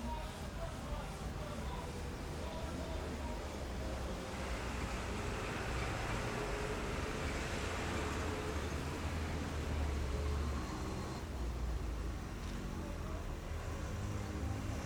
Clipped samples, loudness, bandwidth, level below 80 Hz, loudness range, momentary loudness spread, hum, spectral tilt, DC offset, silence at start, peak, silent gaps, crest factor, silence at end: under 0.1%; -41 LUFS; over 20 kHz; -44 dBFS; 4 LU; 5 LU; none; -5.5 dB/octave; under 0.1%; 0 s; -26 dBFS; none; 14 dB; 0 s